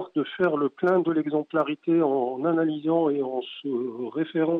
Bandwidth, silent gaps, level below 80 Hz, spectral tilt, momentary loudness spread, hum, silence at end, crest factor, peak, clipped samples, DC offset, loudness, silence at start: 4.1 kHz; none; -74 dBFS; -9 dB/octave; 7 LU; none; 0 s; 14 dB; -12 dBFS; under 0.1%; under 0.1%; -25 LUFS; 0 s